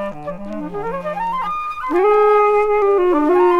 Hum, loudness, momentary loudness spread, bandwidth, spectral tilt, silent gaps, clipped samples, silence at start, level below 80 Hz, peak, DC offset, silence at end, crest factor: none; -16 LUFS; 14 LU; 6.8 kHz; -7 dB/octave; none; under 0.1%; 0 s; -44 dBFS; -6 dBFS; under 0.1%; 0 s; 10 dB